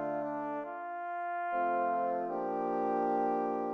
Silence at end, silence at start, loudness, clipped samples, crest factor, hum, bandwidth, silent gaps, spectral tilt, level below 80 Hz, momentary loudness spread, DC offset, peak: 0 s; 0 s; -34 LUFS; under 0.1%; 12 dB; none; 6.2 kHz; none; -8.5 dB/octave; -78 dBFS; 7 LU; under 0.1%; -20 dBFS